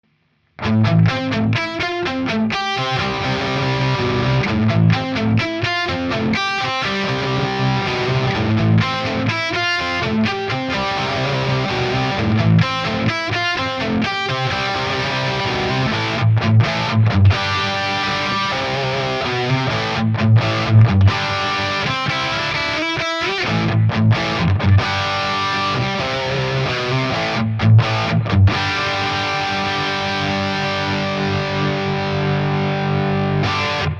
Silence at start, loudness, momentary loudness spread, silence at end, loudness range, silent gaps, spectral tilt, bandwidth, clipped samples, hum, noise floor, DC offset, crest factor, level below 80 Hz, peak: 0.6 s; -18 LUFS; 5 LU; 0 s; 3 LU; none; -6 dB/octave; 7.4 kHz; under 0.1%; none; -62 dBFS; under 0.1%; 16 dB; -42 dBFS; -2 dBFS